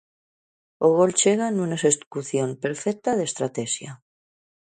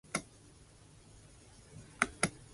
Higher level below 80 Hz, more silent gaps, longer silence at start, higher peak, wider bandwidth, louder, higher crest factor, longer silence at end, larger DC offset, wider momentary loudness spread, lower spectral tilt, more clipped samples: second, -68 dBFS vs -62 dBFS; first, 2.06-2.11 s vs none; first, 0.8 s vs 0.15 s; about the same, -6 dBFS vs -8 dBFS; second, 9.6 kHz vs 11.5 kHz; first, -23 LUFS vs -36 LUFS; second, 18 dB vs 34 dB; first, 0.75 s vs 0 s; neither; second, 10 LU vs 26 LU; about the same, -4 dB/octave vs -3 dB/octave; neither